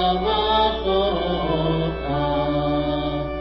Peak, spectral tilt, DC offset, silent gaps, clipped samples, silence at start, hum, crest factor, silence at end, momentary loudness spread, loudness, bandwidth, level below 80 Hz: -8 dBFS; -8.5 dB/octave; under 0.1%; none; under 0.1%; 0 s; none; 14 dB; 0 s; 5 LU; -22 LUFS; 6 kHz; -34 dBFS